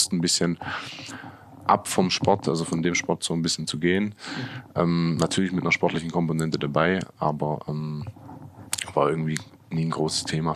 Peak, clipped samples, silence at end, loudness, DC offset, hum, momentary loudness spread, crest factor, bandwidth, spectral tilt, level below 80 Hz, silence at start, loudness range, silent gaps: -6 dBFS; under 0.1%; 0 s; -25 LUFS; under 0.1%; none; 12 LU; 20 dB; 14.5 kHz; -4.5 dB/octave; -60 dBFS; 0 s; 3 LU; none